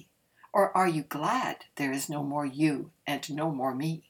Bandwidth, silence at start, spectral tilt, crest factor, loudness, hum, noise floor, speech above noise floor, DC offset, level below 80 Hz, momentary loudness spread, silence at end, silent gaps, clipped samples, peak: 19 kHz; 0.55 s; -5.5 dB/octave; 20 dB; -30 LUFS; none; -61 dBFS; 32 dB; under 0.1%; -76 dBFS; 8 LU; 0.1 s; none; under 0.1%; -12 dBFS